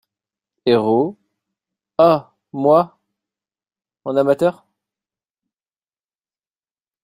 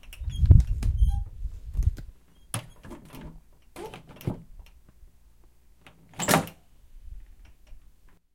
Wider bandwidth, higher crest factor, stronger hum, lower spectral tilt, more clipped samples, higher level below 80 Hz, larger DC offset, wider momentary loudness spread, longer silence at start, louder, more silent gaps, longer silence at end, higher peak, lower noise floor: about the same, 15 kHz vs 16.5 kHz; second, 20 dB vs 26 dB; neither; first, -7.5 dB/octave vs -5.5 dB/octave; neither; second, -64 dBFS vs -30 dBFS; second, under 0.1% vs 0.1%; second, 12 LU vs 27 LU; first, 0.65 s vs 0.1 s; first, -17 LUFS vs -27 LUFS; neither; first, 2.5 s vs 0.55 s; about the same, -2 dBFS vs -4 dBFS; first, under -90 dBFS vs -57 dBFS